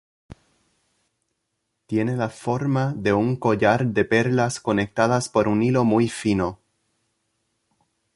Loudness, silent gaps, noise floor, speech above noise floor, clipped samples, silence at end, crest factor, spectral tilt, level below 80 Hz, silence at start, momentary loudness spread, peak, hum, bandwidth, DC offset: -22 LUFS; none; -77 dBFS; 56 dB; under 0.1%; 1.6 s; 20 dB; -6.5 dB/octave; -52 dBFS; 0.3 s; 6 LU; -4 dBFS; none; 11.5 kHz; under 0.1%